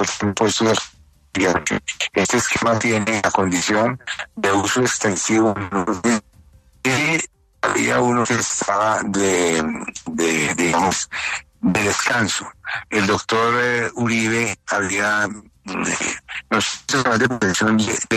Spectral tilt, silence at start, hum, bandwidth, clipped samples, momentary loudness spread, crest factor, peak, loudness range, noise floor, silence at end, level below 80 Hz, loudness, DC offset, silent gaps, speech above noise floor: -3.5 dB/octave; 0 s; none; 13.5 kHz; under 0.1%; 7 LU; 16 dB; -4 dBFS; 1 LU; -50 dBFS; 0 s; -54 dBFS; -19 LUFS; under 0.1%; none; 31 dB